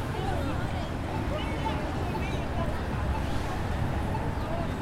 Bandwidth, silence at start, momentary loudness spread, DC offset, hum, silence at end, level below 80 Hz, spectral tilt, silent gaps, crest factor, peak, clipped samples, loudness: 16 kHz; 0 s; 1 LU; under 0.1%; none; 0 s; -36 dBFS; -6.5 dB/octave; none; 14 dB; -16 dBFS; under 0.1%; -31 LUFS